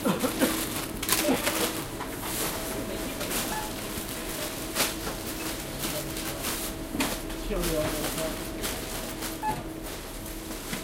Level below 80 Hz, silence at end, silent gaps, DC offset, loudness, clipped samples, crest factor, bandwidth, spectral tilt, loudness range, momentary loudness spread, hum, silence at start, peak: -42 dBFS; 0 s; none; under 0.1%; -30 LUFS; under 0.1%; 24 dB; 17 kHz; -3 dB/octave; 3 LU; 8 LU; none; 0 s; -6 dBFS